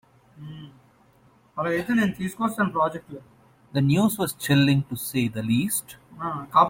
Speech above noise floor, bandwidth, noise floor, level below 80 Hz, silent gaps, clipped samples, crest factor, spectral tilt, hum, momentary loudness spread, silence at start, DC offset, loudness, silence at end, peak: 35 dB; 17 kHz; -58 dBFS; -58 dBFS; none; under 0.1%; 20 dB; -5.5 dB/octave; none; 21 LU; 0.4 s; under 0.1%; -24 LUFS; 0 s; -4 dBFS